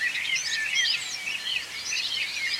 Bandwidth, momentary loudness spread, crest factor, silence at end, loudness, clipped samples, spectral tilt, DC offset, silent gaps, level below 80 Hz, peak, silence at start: 16.5 kHz; 6 LU; 16 dB; 0 s; -26 LUFS; under 0.1%; 2.5 dB/octave; under 0.1%; none; -68 dBFS; -14 dBFS; 0 s